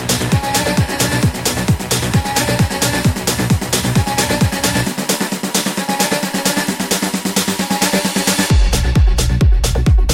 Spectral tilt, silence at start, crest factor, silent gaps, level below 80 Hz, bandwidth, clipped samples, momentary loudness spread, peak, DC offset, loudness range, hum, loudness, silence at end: -4 dB/octave; 0 s; 12 dB; none; -20 dBFS; 17 kHz; under 0.1%; 3 LU; -2 dBFS; under 0.1%; 1 LU; none; -15 LUFS; 0 s